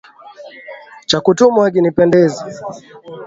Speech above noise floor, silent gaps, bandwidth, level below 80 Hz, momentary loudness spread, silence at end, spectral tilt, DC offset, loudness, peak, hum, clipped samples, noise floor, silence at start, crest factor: 24 dB; none; 7.8 kHz; -54 dBFS; 23 LU; 0 s; -5.5 dB/octave; under 0.1%; -12 LUFS; 0 dBFS; none; under 0.1%; -37 dBFS; 0.25 s; 16 dB